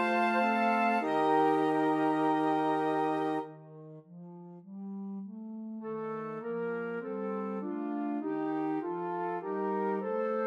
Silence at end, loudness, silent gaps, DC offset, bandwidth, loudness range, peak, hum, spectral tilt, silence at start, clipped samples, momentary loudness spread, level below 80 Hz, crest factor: 0 s; -31 LUFS; none; under 0.1%; 11.5 kHz; 11 LU; -16 dBFS; none; -7 dB/octave; 0 s; under 0.1%; 18 LU; under -90 dBFS; 16 dB